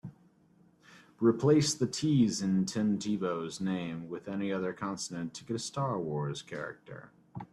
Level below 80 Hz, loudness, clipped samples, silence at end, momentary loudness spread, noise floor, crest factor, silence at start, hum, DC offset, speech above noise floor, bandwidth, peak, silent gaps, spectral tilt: -68 dBFS; -32 LUFS; under 0.1%; 0.05 s; 15 LU; -64 dBFS; 18 dB; 0.05 s; none; under 0.1%; 33 dB; 13 kHz; -14 dBFS; none; -5.5 dB/octave